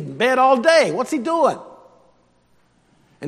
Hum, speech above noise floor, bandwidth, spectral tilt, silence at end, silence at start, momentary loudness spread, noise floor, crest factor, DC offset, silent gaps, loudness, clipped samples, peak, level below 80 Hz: 60 Hz at -50 dBFS; 43 dB; 13.5 kHz; -4 dB/octave; 0 s; 0 s; 8 LU; -59 dBFS; 20 dB; under 0.1%; none; -17 LUFS; under 0.1%; 0 dBFS; -70 dBFS